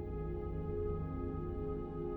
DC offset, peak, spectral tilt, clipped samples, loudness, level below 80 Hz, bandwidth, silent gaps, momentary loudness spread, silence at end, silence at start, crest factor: under 0.1%; -26 dBFS; -11.5 dB/octave; under 0.1%; -41 LUFS; -46 dBFS; 4 kHz; none; 2 LU; 0 s; 0 s; 12 dB